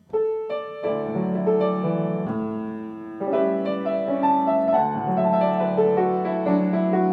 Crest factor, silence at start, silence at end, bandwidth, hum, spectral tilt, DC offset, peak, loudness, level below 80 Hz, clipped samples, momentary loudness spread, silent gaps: 14 dB; 0.1 s; 0 s; 4.8 kHz; none; -10.5 dB/octave; under 0.1%; -8 dBFS; -23 LUFS; -64 dBFS; under 0.1%; 8 LU; none